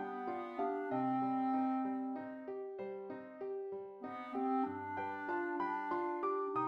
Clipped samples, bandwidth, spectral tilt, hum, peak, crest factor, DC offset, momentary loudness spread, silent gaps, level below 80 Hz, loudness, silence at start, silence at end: under 0.1%; 5.4 kHz; -8.5 dB/octave; none; -26 dBFS; 14 dB; under 0.1%; 10 LU; none; -84 dBFS; -39 LUFS; 0 s; 0 s